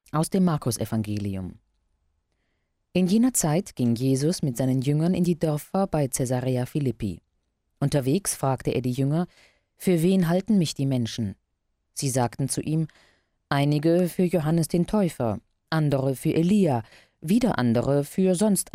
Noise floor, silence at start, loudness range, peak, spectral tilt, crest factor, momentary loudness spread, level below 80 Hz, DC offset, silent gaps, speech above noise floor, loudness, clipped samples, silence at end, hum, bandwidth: -75 dBFS; 0.15 s; 3 LU; -10 dBFS; -6 dB/octave; 14 dB; 9 LU; -52 dBFS; under 0.1%; none; 52 dB; -24 LUFS; under 0.1%; 0.05 s; none; 16 kHz